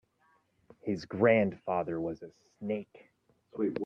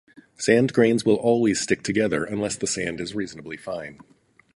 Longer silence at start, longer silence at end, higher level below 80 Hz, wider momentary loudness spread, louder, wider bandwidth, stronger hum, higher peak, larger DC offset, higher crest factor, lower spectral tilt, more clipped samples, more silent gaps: first, 0.85 s vs 0.4 s; second, 0 s vs 0.6 s; second, -70 dBFS vs -56 dBFS; first, 21 LU vs 14 LU; second, -32 LUFS vs -23 LUFS; second, 7.6 kHz vs 11.5 kHz; neither; second, -12 dBFS vs -4 dBFS; neither; about the same, 22 dB vs 20 dB; first, -8 dB/octave vs -4.5 dB/octave; neither; neither